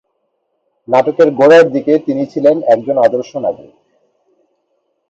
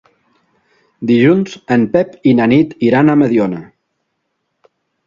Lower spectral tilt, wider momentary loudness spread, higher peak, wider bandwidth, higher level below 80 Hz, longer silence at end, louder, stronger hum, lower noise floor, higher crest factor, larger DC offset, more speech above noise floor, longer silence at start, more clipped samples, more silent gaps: second, -6.5 dB/octave vs -8 dB/octave; first, 13 LU vs 6 LU; about the same, 0 dBFS vs 0 dBFS; about the same, 8 kHz vs 7.4 kHz; second, -62 dBFS vs -54 dBFS; about the same, 1.55 s vs 1.45 s; about the same, -12 LUFS vs -13 LUFS; neither; second, -66 dBFS vs -70 dBFS; about the same, 14 dB vs 14 dB; neither; about the same, 55 dB vs 58 dB; about the same, 0.9 s vs 1 s; neither; neither